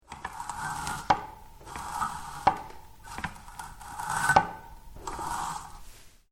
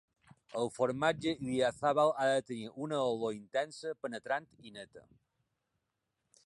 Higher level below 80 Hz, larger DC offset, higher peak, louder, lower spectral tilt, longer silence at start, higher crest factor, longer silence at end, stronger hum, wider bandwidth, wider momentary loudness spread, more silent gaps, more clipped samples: first, -50 dBFS vs -72 dBFS; neither; first, -4 dBFS vs -16 dBFS; first, -31 LUFS vs -34 LUFS; second, -3 dB/octave vs -5 dB/octave; second, 0.1 s vs 0.55 s; first, 28 dB vs 20 dB; second, 0.15 s vs 1.45 s; neither; first, 18 kHz vs 11.5 kHz; first, 21 LU vs 17 LU; neither; neither